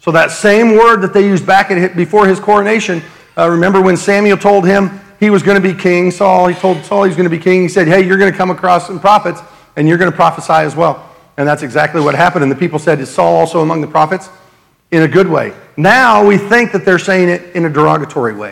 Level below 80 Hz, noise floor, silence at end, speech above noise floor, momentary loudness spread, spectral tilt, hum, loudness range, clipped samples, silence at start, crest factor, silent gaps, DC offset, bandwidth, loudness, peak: -50 dBFS; -48 dBFS; 0 s; 38 dB; 7 LU; -6 dB/octave; none; 3 LU; 1%; 0.05 s; 10 dB; none; under 0.1%; 15 kHz; -10 LUFS; 0 dBFS